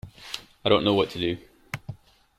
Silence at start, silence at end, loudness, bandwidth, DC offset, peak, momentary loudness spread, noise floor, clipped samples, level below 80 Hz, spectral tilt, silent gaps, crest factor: 0.05 s; 0.45 s; -24 LUFS; 15.5 kHz; under 0.1%; -6 dBFS; 17 LU; -43 dBFS; under 0.1%; -56 dBFS; -5.5 dB/octave; none; 22 dB